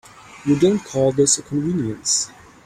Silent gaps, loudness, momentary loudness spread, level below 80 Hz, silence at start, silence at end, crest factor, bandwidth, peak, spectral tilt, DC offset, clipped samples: none; -19 LUFS; 6 LU; -54 dBFS; 0.3 s; 0.35 s; 18 dB; 15 kHz; -2 dBFS; -4.5 dB/octave; under 0.1%; under 0.1%